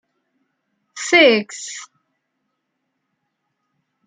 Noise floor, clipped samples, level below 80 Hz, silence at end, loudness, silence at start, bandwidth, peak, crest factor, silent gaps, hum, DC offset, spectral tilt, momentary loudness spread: -75 dBFS; under 0.1%; -74 dBFS; 2.2 s; -13 LUFS; 0.95 s; 9.6 kHz; -2 dBFS; 20 dB; none; none; under 0.1%; -2 dB/octave; 20 LU